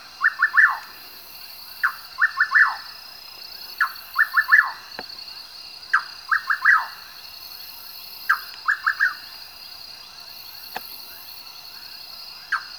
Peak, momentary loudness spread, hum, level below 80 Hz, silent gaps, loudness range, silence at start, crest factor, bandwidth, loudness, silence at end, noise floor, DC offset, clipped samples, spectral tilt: -2 dBFS; 21 LU; none; -68 dBFS; none; 8 LU; 0 s; 22 dB; over 20 kHz; -20 LUFS; 0 s; -41 dBFS; 0.1%; under 0.1%; 1 dB/octave